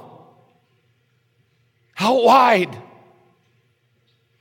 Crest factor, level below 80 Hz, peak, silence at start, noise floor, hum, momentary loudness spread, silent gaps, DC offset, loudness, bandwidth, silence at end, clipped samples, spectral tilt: 18 dB; -70 dBFS; -2 dBFS; 1.95 s; -64 dBFS; none; 26 LU; none; under 0.1%; -16 LUFS; 17 kHz; 1.6 s; under 0.1%; -4.5 dB/octave